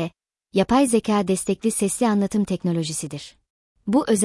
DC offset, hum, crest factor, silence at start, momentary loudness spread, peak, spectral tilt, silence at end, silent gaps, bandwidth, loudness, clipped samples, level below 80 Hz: under 0.1%; none; 16 dB; 0 s; 14 LU; -6 dBFS; -5 dB/octave; 0 s; 3.50-3.76 s; 12 kHz; -22 LUFS; under 0.1%; -54 dBFS